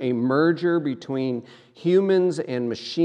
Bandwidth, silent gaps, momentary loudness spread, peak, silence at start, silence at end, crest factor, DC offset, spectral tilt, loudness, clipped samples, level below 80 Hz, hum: 9.6 kHz; none; 9 LU; -8 dBFS; 0 s; 0 s; 14 dB; under 0.1%; -7 dB/octave; -23 LUFS; under 0.1%; -76 dBFS; none